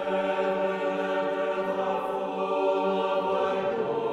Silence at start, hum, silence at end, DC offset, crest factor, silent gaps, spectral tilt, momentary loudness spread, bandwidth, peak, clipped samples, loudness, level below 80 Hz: 0 s; none; 0 s; under 0.1%; 12 dB; none; -6 dB/octave; 3 LU; 10.5 kHz; -14 dBFS; under 0.1%; -27 LUFS; -68 dBFS